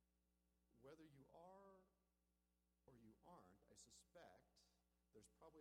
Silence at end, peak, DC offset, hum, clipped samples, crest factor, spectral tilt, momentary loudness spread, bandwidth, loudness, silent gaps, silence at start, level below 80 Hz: 0 s; -54 dBFS; under 0.1%; 60 Hz at -85 dBFS; under 0.1%; 18 dB; -4 dB/octave; 2 LU; 10.5 kHz; -69 LUFS; none; 0 s; -86 dBFS